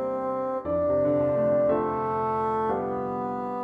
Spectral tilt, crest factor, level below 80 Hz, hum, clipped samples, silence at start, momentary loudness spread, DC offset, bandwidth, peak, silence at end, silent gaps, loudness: -10 dB/octave; 14 dB; -58 dBFS; none; under 0.1%; 0 s; 6 LU; under 0.1%; 4.7 kHz; -12 dBFS; 0 s; none; -26 LUFS